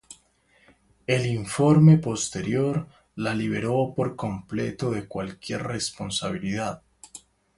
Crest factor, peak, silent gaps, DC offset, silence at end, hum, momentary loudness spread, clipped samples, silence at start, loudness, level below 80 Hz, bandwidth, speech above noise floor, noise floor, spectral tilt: 20 dB; -6 dBFS; none; under 0.1%; 0.4 s; none; 18 LU; under 0.1%; 0.1 s; -25 LUFS; -54 dBFS; 11.5 kHz; 38 dB; -62 dBFS; -6 dB/octave